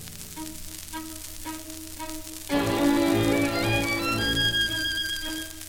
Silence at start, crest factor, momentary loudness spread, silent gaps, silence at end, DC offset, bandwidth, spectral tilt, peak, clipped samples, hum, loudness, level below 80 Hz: 0 s; 16 dB; 14 LU; none; 0 s; 0.3%; 17.5 kHz; -3.5 dB/octave; -10 dBFS; under 0.1%; none; -26 LUFS; -44 dBFS